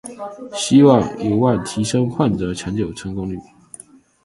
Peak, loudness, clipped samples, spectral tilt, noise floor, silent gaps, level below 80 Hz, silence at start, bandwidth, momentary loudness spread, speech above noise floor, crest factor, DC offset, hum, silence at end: 0 dBFS; -18 LUFS; under 0.1%; -6 dB/octave; -43 dBFS; none; -46 dBFS; 0.05 s; 11.5 kHz; 17 LU; 26 dB; 18 dB; under 0.1%; none; 0.8 s